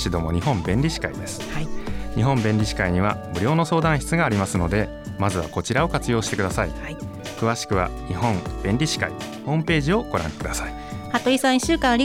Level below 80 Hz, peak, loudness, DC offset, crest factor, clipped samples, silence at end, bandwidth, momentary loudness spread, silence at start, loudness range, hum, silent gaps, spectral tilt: -36 dBFS; -6 dBFS; -23 LUFS; under 0.1%; 16 dB; under 0.1%; 0 s; 16.5 kHz; 10 LU; 0 s; 3 LU; none; none; -5.5 dB/octave